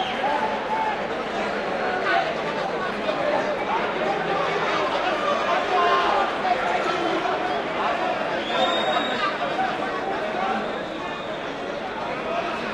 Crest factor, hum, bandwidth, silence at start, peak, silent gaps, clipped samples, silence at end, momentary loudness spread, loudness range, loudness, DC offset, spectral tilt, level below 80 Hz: 16 dB; none; 12 kHz; 0 s; -8 dBFS; none; under 0.1%; 0 s; 7 LU; 3 LU; -24 LUFS; under 0.1%; -4 dB/octave; -54 dBFS